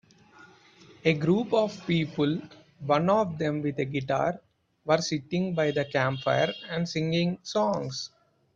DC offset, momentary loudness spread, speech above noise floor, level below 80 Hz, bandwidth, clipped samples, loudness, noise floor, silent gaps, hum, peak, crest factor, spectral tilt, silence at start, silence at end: under 0.1%; 8 LU; 28 dB; -64 dBFS; 7.6 kHz; under 0.1%; -27 LUFS; -55 dBFS; none; none; -8 dBFS; 20 dB; -6 dB/octave; 0.9 s; 0.5 s